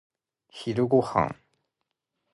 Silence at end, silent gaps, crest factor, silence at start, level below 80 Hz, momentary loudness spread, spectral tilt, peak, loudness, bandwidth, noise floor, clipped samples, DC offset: 1 s; none; 22 dB; 0.55 s; -58 dBFS; 14 LU; -7.5 dB/octave; -6 dBFS; -26 LUFS; 11.5 kHz; -82 dBFS; under 0.1%; under 0.1%